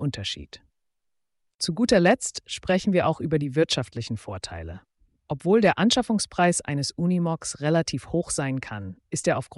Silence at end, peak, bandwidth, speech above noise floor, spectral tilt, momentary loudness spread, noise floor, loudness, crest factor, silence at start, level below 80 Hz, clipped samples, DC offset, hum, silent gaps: 0.05 s; -8 dBFS; 11.5 kHz; 54 dB; -4.5 dB/octave; 15 LU; -78 dBFS; -24 LUFS; 16 dB; 0 s; -52 dBFS; under 0.1%; under 0.1%; none; 1.55-1.59 s